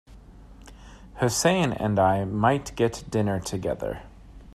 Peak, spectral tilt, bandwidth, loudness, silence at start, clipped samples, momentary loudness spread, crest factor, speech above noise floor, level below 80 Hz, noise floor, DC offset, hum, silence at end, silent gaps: -6 dBFS; -5 dB/octave; 14.5 kHz; -25 LUFS; 0.1 s; under 0.1%; 10 LU; 20 dB; 23 dB; -48 dBFS; -47 dBFS; under 0.1%; none; 0.05 s; none